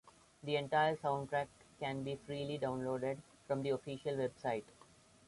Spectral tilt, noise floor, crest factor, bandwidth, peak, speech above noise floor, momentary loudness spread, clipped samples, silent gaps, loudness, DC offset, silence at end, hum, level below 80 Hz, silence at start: -6 dB/octave; -64 dBFS; 18 dB; 11.5 kHz; -22 dBFS; 26 dB; 9 LU; under 0.1%; none; -39 LUFS; under 0.1%; 0.55 s; none; -72 dBFS; 0.05 s